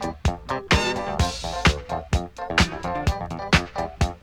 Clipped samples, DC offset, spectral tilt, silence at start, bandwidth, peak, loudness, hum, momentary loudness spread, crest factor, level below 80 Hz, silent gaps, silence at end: under 0.1%; under 0.1%; -4.5 dB/octave; 0 s; 16 kHz; -2 dBFS; -24 LUFS; none; 7 LU; 22 dB; -32 dBFS; none; 0.05 s